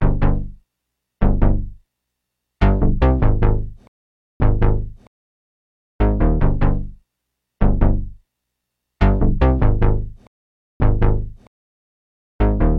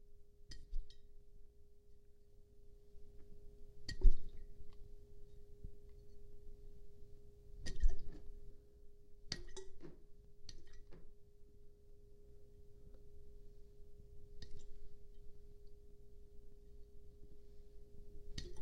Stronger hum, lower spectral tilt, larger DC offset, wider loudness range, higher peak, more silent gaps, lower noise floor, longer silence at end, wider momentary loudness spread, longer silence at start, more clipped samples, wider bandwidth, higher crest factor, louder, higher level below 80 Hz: neither; first, -10.5 dB/octave vs -4.5 dB/octave; neither; second, 2 LU vs 17 LU; first, -2 dBFS vs -14 dBFS; first, 3.88-4.40 s, 5.07-5.99 s, 10.27-10.80 s, 11.47-12.39 s vs none; first, -78 dBFS vs -60 dBFS; about the same, 0 s vs 0 s; second, 11 LU vs 20 LU; about the same, 0 s vs 0 s; neither; second, 4.3 kHz vs 7.6 kHz; second, 16 dB vs 26 dB; first, -20 LUFS vs -49 LUFS; first, -20 dBFS vs -44 dBFS